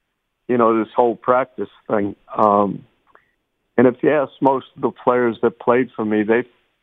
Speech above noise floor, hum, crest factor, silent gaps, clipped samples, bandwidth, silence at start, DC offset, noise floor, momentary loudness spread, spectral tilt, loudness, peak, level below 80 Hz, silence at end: 51 dB; none; 18 dB; none; under 0.1%; 4 kHz; 0.5 s; under 0.1%; -69 dBFS; 10 LU; -9.5 dB/octave; -18 LUFS; 0 dBFS; -62 dBFS; 0.4 s